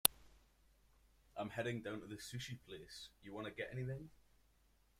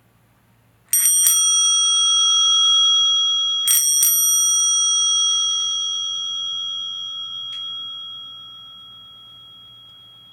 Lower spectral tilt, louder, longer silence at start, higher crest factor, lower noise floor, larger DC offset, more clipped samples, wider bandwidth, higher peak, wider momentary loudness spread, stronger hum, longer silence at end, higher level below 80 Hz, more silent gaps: first, -3 dB/octave vs 5 dB/octave; second, -46 LUFS vs -15 LUFS; second, 0.05 s vs 0.95 s; first, 40 dB vs 20 dB; first, -74 dBFS vs -57 dBFS; neither; neither; second, 16 kHz vs over 20 kHz; second, -6 dBFS vs 0 dBFS; second, 11 LU vs 15 LU; neither; first, 0.9 s vs 0.65 s; about the same, -70 dBFS vs -72 dBFS; neither